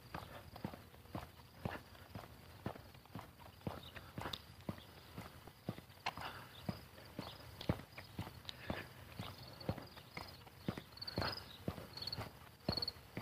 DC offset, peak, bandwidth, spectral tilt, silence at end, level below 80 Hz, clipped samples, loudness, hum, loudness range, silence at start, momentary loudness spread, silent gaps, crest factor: under 0.1%; -24 dBFS; 15.5 kHz; -5 dB/octave; 0 s; -62 dBFS; under 0.1%; -48 LUFS; none; 5 LU; 0 s; 11 LU; none; 26 dB